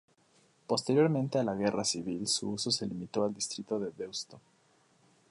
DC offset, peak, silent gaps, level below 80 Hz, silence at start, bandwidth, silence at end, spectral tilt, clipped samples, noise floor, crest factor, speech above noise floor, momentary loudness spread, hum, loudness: under 0.1%; -16 dBFS; none; -70 dBFS; 0.7 s; 11.5 kHz; 0.95 s; -4 dB/octave; under 0.1%; -68 dBFS; 18 dB; 36 dB; 11 LU; none; -32 LUFS